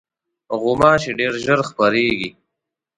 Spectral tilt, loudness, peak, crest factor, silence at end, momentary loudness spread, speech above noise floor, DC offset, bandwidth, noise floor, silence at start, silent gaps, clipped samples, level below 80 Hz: -5 dB/octave; -18 LUFS; 0 dBFS; 18 dB; 0.65 s; 10 LU; 64 dB; under 0.1%; 11 kHz; -81 dBFS; 0.5 s; none; under 0.1%; -50 dBFS